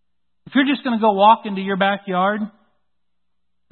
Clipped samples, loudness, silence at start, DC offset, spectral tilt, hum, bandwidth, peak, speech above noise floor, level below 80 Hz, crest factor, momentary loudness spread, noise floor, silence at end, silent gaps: under 0.1%; -18 LUFS; 0.45 s; under 0.1%; -10.5 dB/octave; none; 4.3 kHz; -2 dBFS; 62 dB; -70 dBFS; 18 dB; 9 LU; -79 dBFS; 1.25 s; none